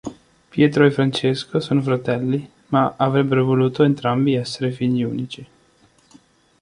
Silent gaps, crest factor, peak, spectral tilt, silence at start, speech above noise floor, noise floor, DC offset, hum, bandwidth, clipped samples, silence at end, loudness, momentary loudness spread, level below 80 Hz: none; 18 dB; -2 dBFS; -7 dB/octave; 0.05 s; 38 dB; -56 dBFS; under 0.1%; none; 11 kHz; under 0.1%; 1.15 s; -19 LUFS; 10 LU; -58 dBFS